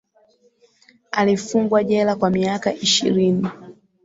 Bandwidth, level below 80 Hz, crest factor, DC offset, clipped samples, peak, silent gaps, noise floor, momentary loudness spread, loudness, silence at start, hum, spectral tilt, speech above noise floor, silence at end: 8 kHz; -58 dBFS; 16 dB; under 0.1%; under 0.1%; -4 dBFS; none; -58 dBFS; 6 LU; -19 LUFS; 1.15 s; none; -4.5 dB/octave; 40 dB; 0.35 s